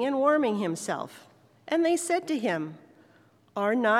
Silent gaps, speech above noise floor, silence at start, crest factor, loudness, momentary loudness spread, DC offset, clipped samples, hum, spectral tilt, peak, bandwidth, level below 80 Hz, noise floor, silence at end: none; 34 dB; 0 s; 16 dB; -27 LUFS; 12 LU; under 0.1%; under 0.1%; none; -4.5 dB/octave; -12 dBFS; 15 kHz; -88 dBFS; -60 dBFS; 0 s